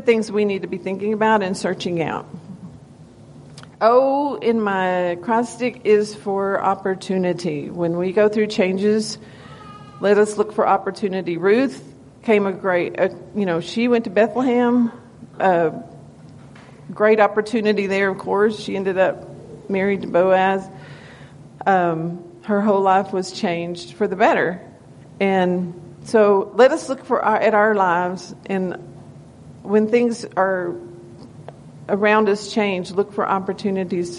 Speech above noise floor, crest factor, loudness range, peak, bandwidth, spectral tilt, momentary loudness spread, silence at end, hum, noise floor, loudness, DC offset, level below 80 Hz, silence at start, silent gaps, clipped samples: 25 dB; 18 dB; 3 LU; -2 dBFS; 11 kHz; -6 dB/octave; 18 LU; 0 s; none; -44 dBFS; -19 LUFS; under 0.1%; -60 dBFS; 0 s; none; under 0.1%